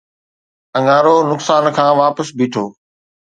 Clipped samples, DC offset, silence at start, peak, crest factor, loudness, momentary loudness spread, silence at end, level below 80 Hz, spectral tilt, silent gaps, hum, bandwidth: under 0.1%; under 0.1%; 0.75 s; 0 dBFS; 16 dB; -14 LUFS; 11 LU; 0.5 s; -66 dBFS; -5.5 dB/octave; none; none; 9.4 kHz